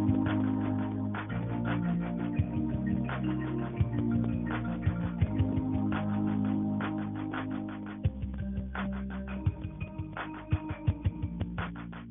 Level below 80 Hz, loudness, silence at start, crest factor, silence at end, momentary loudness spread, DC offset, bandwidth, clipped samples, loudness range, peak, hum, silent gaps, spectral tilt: -44 dBFS; -33 LUFS; 0 s; 18 dB; 0 s; 8 LU; under 0.1%; 3.8 kHz; under 0.1%; 5 LU; -14 dBFS; none; none; -7 dB/octave